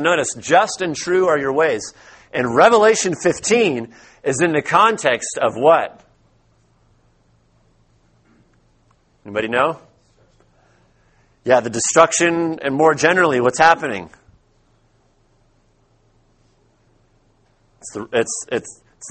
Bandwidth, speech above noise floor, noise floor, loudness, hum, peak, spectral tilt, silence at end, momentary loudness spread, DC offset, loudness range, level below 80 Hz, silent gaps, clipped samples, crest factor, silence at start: 8.8 kHz; 42 dB; -58 dBFS; -17 LUFS; none; 0 dBFS; -3.5 dB/octave; 0 s; 15 LU; under 0.1%; 12 LU; -58 dBFS; none; under 0.1%; 20 dB; 0 s